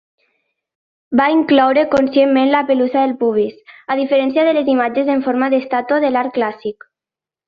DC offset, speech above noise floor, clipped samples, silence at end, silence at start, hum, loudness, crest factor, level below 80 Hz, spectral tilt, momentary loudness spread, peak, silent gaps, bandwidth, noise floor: under 0.1%; 74 dB; under 0.1%; 0.75 s; 1.1 s; none; -15 LUFS; 14 dB; -58 dBFS; -6.5 dB/octave; 8 LU; -2 dBFS; none; 6.8 kHz; -89 dBFS